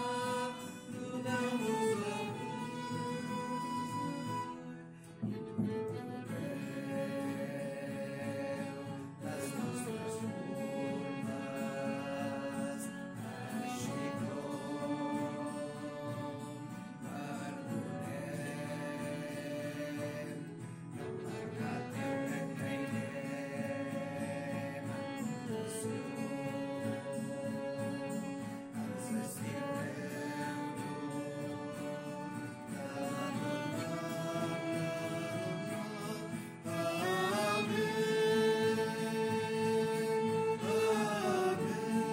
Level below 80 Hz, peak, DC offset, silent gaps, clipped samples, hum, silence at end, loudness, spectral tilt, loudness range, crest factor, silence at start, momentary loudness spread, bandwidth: -74 dBFS; -20 dBFS; under 0.1%; none; under 0.1%; none; 0 s; -38 LUFS; -5.5 dB/octave; 8 LU; 18 dB; 0 s; 10 LU; 16 kHz